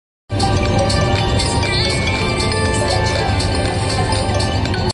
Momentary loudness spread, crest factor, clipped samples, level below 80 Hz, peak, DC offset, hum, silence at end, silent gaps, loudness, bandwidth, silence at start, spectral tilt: 2 LU; 14 dB; under 0.1%; -24 dBFS; -4 dBFS; under 0.1%; none; 0 s; none; -17 LUFS; 11.5 kHz; 0.3 s; -4.5 dB/octave